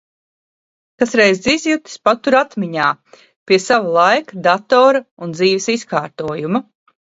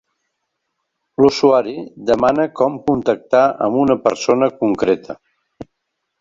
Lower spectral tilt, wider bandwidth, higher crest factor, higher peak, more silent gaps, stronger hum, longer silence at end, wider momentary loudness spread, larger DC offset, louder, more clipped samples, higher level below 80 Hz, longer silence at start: second, -4 dB/octave vs -6 dB/octave; about the same, 8 kHz vs 7.6 kHz; about the same, 16 dB vs 16 dB; about the same, 0 dBFS vs -2 dBFS; first, 3.36-3.46 s, 5.11-5.17 s vs none; neither; second, 0.4 s vs 0.55 s; about the same, 9 LU vs 10 LU; neither; about the same, -15 LUFS vs -16 LUFS; neither; second, -58 dBFS vs -52 dBFS; second, 1 s vs 1.2 s